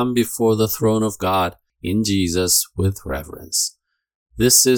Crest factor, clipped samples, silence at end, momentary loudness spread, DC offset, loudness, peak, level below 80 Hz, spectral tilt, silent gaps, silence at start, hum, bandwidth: 18 dB; under 0.1%; 0 s; 10 LU; under 0.1%; -19 LUFS; 0 dBFS; -44 dBFS; -3.5 dB/octave; 4.15-4.26 s; 0 s; none; 19 kHz